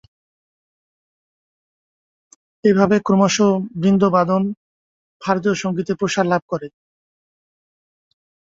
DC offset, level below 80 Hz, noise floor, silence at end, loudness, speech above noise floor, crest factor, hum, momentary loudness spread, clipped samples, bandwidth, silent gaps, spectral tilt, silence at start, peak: under 0.1%; -58 dBFS; under -90 dBFS; 1.85 s; -18 LUFS; over 73 dB; 18 dB; none; 13 LU; under 0.1%; 7.8 kHz; 4.57-5.20 s, 6.42-6.48 s; -6 dB/octave; 2.65 s; -2 dBFS